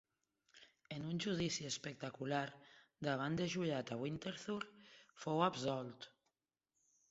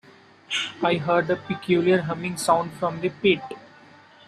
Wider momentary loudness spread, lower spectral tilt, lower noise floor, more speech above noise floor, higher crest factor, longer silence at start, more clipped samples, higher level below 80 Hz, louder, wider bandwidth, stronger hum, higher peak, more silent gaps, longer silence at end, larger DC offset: first, 15 LU vs 8 LU; about the same, -4.5 dB/octave vs -5 dB/octave; first, -90 dBFS vs -50 dBFS; first, 48 dB vs 27 dB; first, 24 dB vs 18 dB; about the same, 0.55 s vs 0.5 s; neither; second, -74 dBFS vs -64 dBFS; second, -42 LUFS vs -23 LUFS; second, 7.6 kHz vs 13.5 kHz; neither; second, -20 dBFS vs -6 dBFS; neither; first, 1.05 s vs 0.65 s; neither